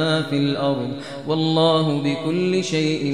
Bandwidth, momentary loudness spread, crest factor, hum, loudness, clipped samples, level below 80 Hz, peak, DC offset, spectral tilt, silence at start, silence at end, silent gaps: 10.5 kHz; 8 LU; 14 dB; none; -21 LUFS; under 0.1%; -62 dBFS; -6 dBFS; 0.3%; -6 dB/octave; 0 s; 0 s; none